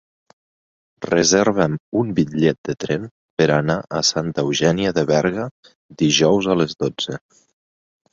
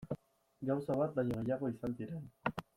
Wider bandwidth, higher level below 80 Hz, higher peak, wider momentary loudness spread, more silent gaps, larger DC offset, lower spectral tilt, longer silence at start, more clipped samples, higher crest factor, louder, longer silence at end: second, 7.8 kHz vs 15.5 kHz; first, -52 dBFS vs -64 dBFS; first, -2 dBFS vs -18 dBFS; about the same, 11 LU vs 10 LU; first, 1.80-1.92 s, 2.58-2.64 s, 3.11-3.37 s, 5.51-5.63 s, 5.75-5.89 s vs none; neither; second, -4.5 dB/octave vs -8.5 dB/octave; first, 1 s vs 0 s; neither; about the same, 18 dB vs 20 dB; first, -19 LUFS vs -39 LUFS; first, 0.95 s vs 0.15 s